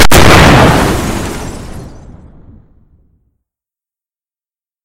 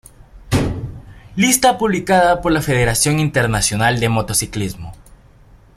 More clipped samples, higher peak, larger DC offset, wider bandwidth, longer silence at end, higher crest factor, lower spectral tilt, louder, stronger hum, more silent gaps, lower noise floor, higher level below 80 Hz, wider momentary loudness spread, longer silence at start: first, 1% vs under 0.1%; about the same, 0 dBFS vs 0 dBFS; neither; first, over 20 kHz vs 16.5 kHz; first, 2.7 s vs 0.85 s; second, 10 dB vs 18 dB; about the same, -4.5 dB/octave vs -4 dB/octave; first, -7 LUFS vs -16 LUFS; neither; neither; first, under -90 dBFS vs -46 dBFS; first, -20 dBFS vs -36 dBFS; first, 23 LU vs 14 LU; second, 0 s vs 0.35 s